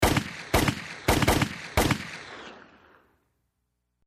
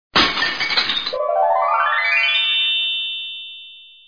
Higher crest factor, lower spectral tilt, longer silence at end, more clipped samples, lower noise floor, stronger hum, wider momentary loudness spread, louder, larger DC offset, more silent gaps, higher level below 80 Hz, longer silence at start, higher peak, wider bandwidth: about the same, 20 dB vs 18 dB; first, -4.5 dB/octave vs -2 dB/octave; first, 1.45 s vs 0.15 s; neither; first, -78 dBFS vs -41 dBFS; first, 60 Hz at -50 dBFS vs none; first, 18 LU vs 12 LU; second, -26 LUFS vs -17 LUFS; neither; neither; first, -38 dBFS vs -52 dBFS; second, 0 s vs 0.15 s; second, -8 dBFS vs -2 dBFS; first, 15.5 kHz vs 5.4 kHz